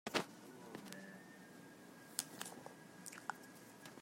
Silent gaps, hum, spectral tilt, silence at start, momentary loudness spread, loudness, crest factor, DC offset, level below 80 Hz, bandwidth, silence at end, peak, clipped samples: none; none; -2.5 dB/octave; 0.05 s; 14 LU; -50 LUFS; 34 dB; under 0.1%; -88 dBFS; 16 kHz; 0 s; -18 dBFS; under 0.1%